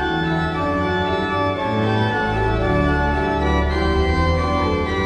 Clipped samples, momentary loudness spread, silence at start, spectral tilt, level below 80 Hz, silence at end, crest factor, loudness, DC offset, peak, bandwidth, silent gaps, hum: under 0.1%; 2 LU; 0 s; -7 dB/octave; -26 dBFS; 0 s; 14 dB; -19 LUFS; under 0.1%; -6 dBFS; 9.2 kHz; none; none